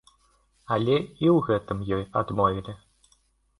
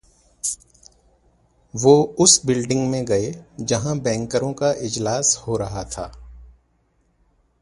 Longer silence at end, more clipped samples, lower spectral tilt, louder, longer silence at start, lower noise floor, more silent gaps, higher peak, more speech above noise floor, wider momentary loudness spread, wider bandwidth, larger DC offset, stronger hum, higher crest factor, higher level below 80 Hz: second, 0.85 s vs 1.15 s; neither; first, -8.5 dB/octave vs -4 dB/octave; second, -25 LUFS vs -20 LUFS; first, 0.7 s vs 0.45 s; about the same, -66 dBFS vs -64 dBFS; neither; second, -8 dBFS vs 0 dBFS; about the same, 41 dB vs 44 dB; second, 11 LU vs 17 LU; about the same, 11.5 kHz vs 11.5 kHz; neither; neither; about the same, 18 dB vs 22 dB; about the same, -52 dBFS vs -48 dBFS